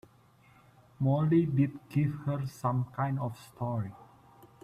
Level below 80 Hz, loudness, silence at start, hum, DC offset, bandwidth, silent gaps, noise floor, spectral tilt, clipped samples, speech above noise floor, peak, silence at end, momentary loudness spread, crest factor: -64 dBFS; -31 LUFS; 1 s; none; under 0.1%; 13.5 kHz; none; -61 dBFS; -9 dB/octave; under 0.1%; 31 dB; -16 dBFS; 0.6 s; 11 LU; 16 dB